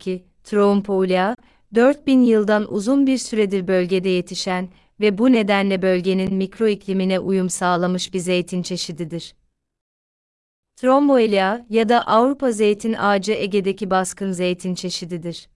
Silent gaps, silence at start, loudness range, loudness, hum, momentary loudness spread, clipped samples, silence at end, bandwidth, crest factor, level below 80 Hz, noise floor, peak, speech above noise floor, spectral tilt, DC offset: 9.81-10.63 s; 0.05 s; 5 LU; -19 LUFS; none; 10 LU; under 0.1%; 0.15 s; 12 kHz; 16 dB; -56 dBFS; under -90 dBFS; -4 dBFS; over 71 dB; -5.5 dB/octave; under 0.1%